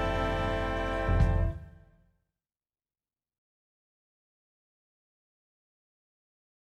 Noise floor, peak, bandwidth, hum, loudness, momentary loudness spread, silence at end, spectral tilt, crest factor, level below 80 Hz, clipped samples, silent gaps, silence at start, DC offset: under -90 dBFS; -12 dBFS; 8.8 kHz; none; -30 LUFS; 6 LU; 5 s; -7 dB/octave; 22 dB; -38 dBFS; under 0.1%; none; 0 s; under 0.1%